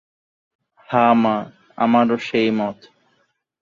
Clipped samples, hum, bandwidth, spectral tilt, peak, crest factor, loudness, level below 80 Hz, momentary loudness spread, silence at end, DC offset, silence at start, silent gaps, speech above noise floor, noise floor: under 0.1%; none; 7 kHz; -7 dB/octave; -2 dBFS; 18 dB; -18 LUFS; -64 dBFS; 10 LU; 0.9 s; under 0.1%; 0.9 s; none; 49 dB; -66 dBFS